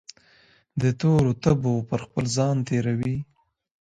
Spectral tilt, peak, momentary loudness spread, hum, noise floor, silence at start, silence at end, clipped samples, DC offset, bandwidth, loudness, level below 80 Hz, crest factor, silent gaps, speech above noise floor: -7 dB/octave; -6 dBFS; 9 LU; none; -58 dBFS; 0.75 s; 0.6 s; under 0.1%; under 0.1%; 9.4 kHz; -24 LUFS; -50 dBFS; 18 dB; none; 36 dB